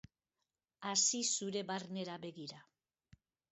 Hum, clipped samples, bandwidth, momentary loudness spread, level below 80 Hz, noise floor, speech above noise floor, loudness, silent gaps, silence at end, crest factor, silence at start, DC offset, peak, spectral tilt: none; under 0.1%; 8 kHz; 16 LU; -80 dBFS; under -90 dBFS; over 51 dB; -37 LUFS; none; 0.9 s; 22 dB; 0.8 s; under 0.1%; -20 dBFS; -3 dB/octave